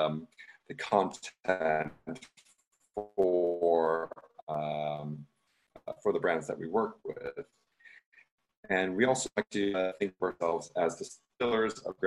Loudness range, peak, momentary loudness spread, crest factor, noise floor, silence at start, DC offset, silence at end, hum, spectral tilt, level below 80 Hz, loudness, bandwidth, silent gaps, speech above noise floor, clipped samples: 4 LU; -10 dBFS; 17 LU; 22 dB; -61 dBFS; 0 s; under 0.1%; 0 s; none; -4.5 dB/octave; -70 dBFS; -32 LUFS; 12 kHz; 2.67-2.71 s, 4.43-4.47 s, 8.06-8.12 s, 8.31-8.38 s, 8.57-8.63 s; 29 dB; under 0.1%